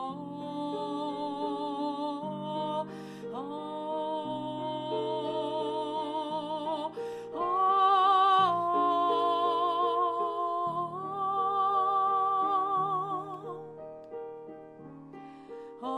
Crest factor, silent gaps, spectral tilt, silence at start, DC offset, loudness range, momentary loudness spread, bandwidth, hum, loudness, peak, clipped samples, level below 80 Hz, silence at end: 14 dB; none; -6 dB/octave; 0 s; under 0.1%; 9 LU; 18 LU; 10.5 kHz; none; -30 LUFS; -16 dBFS; under 0.1%; -76 dBFS; 0 s